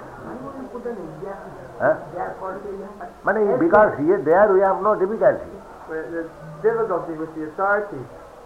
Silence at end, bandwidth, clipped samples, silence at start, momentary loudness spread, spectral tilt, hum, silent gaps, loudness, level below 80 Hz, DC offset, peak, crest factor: 0 s; 10 kHz; under 0.1%; 0 s; 20 LU; -8.5 dB/octave; none; none; -21 LUFS; -52 dBFS; under 0.1%; -4 dBFS; 18 dB